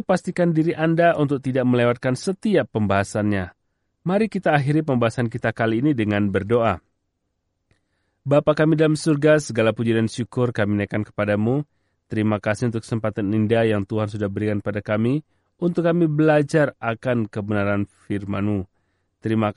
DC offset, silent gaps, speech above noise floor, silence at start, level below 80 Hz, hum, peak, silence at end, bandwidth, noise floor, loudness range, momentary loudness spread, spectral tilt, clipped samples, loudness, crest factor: under 0.1%; none; 54 dB; 0.1 s; -56 dBFS; none; -4 dBFS; 0.05 s; 11.5 kHz; -74 dBFS; 3 LU; 8 LU; -7 dB/octave; under 0.1%; -21 LUFS; 18 dB